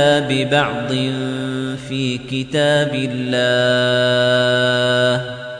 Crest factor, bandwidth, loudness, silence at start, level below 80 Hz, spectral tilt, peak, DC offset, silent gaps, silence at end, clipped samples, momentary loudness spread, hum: 14 dB; 10 kHz; -17 LUFS; 0 s; -52 dBFS; -5 dB/octave; -2 dBFS; under 0.1%; none; 0 s; under 0.1%; 8 LU; none